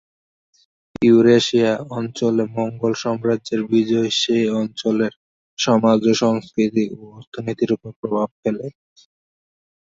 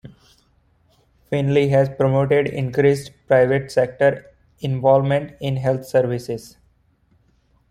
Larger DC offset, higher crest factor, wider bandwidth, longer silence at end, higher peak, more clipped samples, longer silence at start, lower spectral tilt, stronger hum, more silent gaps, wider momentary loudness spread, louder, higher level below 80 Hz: neither; about the same, 18 dB vs 18 dB; second, 7.8 kHz vs 14.5 kHz; second, 1.1 s vs 1.25 s; about the same, -2 dBFS vs -2 dBFS; neither; first, 1 s vs 0.05 s; second, -5.5 dB/octave vs -7.5 dB/octave; neither; first, 5.16-5.57 s, 7.27-7.32 s, 7.96-8.03 s, 8.31-8.43 s vs none; about the same, 12 LU vs 10 LU; about the same, -19 LUFS vs -19 LUFS; second, -60 dBFS vs -54 dBFS